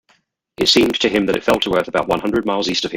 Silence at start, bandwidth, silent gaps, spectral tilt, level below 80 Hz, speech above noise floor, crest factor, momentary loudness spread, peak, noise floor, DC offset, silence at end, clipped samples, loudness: 0.6 s; 17 kHz; none; -3.5 dB/octave; -46 dBFS; 43 dB; 18 dB; 5 LU; 0 dBFS; -60 dBFS; under 0.1%; 0 s; under 0.1%; -17 LUFS